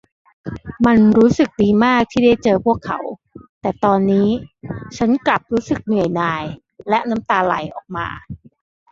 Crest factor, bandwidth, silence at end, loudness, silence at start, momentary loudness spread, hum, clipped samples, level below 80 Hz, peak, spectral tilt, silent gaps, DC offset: 16 dB; 7.4 kHz; 0.55 s; -17 LUFS; 0.45 s; 18 LU; none; under 0.1%; -46 dBFS; -2 dBFS; -7 dB/octave; 3.49-3.61 s; under 0.1%